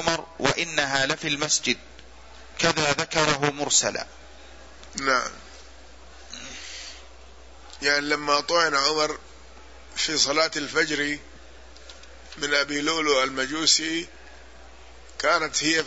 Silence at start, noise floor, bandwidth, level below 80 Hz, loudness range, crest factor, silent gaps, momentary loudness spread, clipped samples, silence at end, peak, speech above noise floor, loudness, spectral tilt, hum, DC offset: 0 s; -48 dBFS; 8.2 kHz; -52 dBFS; 7 LU; 22 dB; none; 18 LU; under 0.1%; 0 s; -4 dBFS; 24 dB; -23 LUFS; -1.5 dB/octave; none; 0.4%